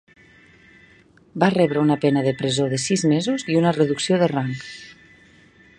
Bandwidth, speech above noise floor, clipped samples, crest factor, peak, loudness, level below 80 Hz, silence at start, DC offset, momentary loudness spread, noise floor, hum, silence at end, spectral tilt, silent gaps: 10.5 kHz; 33 dB; under 0.1%; 20 dB; -2 dBFS; -20 LUFS; -60 dBFS; 1.35 s; under 0.1%; 12 LU; -53 dBFS; none; 0.85 s; -5.5 dB/octave; none